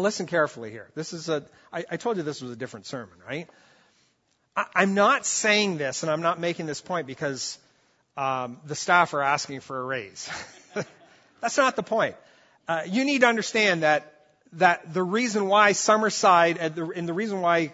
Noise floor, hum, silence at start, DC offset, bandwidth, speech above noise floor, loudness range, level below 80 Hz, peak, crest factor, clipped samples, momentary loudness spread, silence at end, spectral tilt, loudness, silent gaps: -69 dBFS; none; 0 s; under 0.1%; 8 kHz; 45 dB; 9 LU; -72 dBFS; -4 dBFS; 22 dB; under 0.1%; 16 LU; 0 s; -3.5 dB/octave; -24 LUFS; none